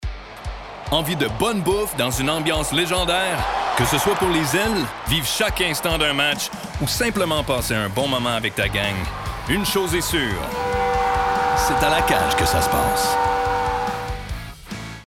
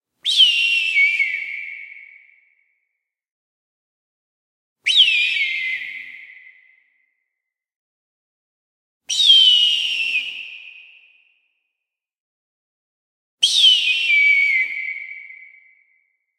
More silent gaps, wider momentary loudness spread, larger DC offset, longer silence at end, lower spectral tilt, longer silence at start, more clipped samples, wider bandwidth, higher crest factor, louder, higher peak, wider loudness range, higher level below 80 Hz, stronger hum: second, none vs 3.31-4.76 s, 7.76-9.00 s, 12.20-13.38 s; second, 10 LU vs 21 LU; first, 0.1% vs under 0.1%; second, 0.05 s vs 1.05 s; first, -3.5 dB/octave vs 5 dB/octave; second, 0 s vs 0.25 s; neither; first, 18 kHz vs 16 kHz; about the same, 18 dB vs 20 dB; second, -20 LUFS vs -14 LUFS; about the same, -4 dBFS vs -2 dBFS; second, 2 LU vs 12 LU; first, -34 dBFS vs -82 dBFS; neither